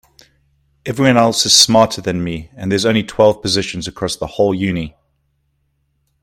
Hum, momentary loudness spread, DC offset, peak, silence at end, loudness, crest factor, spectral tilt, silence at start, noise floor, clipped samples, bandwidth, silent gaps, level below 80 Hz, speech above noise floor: none; 15 LU; under 0.1%; 0 dBFS; 1.35 s; -14 LUFS; 16 dB; -3.5 dB/octave; 0.85 s; -65 dBFS; under 0.1%; 16.5 kHz; none; -46 dBFS; 50 dB